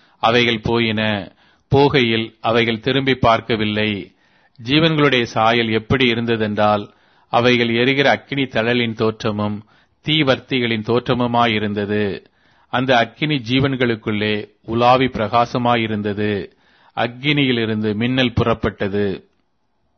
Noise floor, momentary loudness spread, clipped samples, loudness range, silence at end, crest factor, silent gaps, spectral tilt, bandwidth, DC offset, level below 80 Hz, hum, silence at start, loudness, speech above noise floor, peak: -68 dBFS; 9 LU; under 0.1%; 3 LU; 0.8 s; 16 dB; none; -6.5 dB/octave; 6.6 kHz; under 0.1%; -46 dBFS; none; 0.25 s; -18 LUFS; 51 dB; -2 dBFS